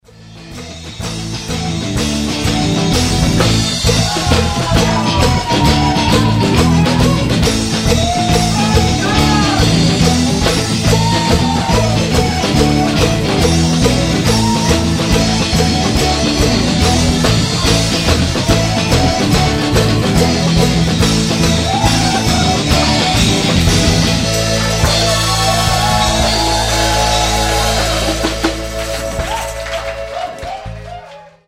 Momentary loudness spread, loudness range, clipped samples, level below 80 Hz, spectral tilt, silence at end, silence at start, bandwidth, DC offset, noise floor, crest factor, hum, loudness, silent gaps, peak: 8 LU; 3 LU; under 0.1%; -22 dBFS; -4.5 dB/octave; 0.25 s; 0.2 s; 16 kHz; under 0.1%; -35 dBFS; 12 dB; none; -13 LUFS; none; 0 dBFS